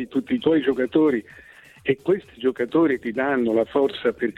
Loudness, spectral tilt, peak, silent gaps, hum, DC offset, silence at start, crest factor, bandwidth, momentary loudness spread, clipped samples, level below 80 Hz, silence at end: -22 LUFS; -7.5 dB/octave; -8 dBFS; none; none; under 0.1%; 0 s; 14 dB; 9.2 kHz; 5 LU; under 0.1%; -58 dBFS; 0.05 s